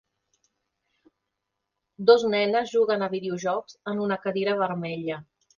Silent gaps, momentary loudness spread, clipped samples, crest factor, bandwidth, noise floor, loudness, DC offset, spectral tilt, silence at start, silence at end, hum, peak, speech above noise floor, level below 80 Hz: none; 12 LU; under 0.1%; 22 dB; 7.2 kHz; -82 dBFS; -25 LUFS; under 0.1%; -5.5 dB/octave; 2 s; 0.35 s; none; -4 dBFS; 58 dB; -70 dBFS